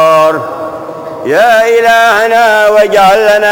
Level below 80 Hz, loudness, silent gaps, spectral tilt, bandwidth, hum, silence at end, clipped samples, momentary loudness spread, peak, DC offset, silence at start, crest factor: -46 dBFS; -6 LUFS; none; -3 dB/octave; 17.5 kHz; none; 0 s; under 0.1%; 14 LU; 0 dBFS; under 0.1%; 0 s; 8 dB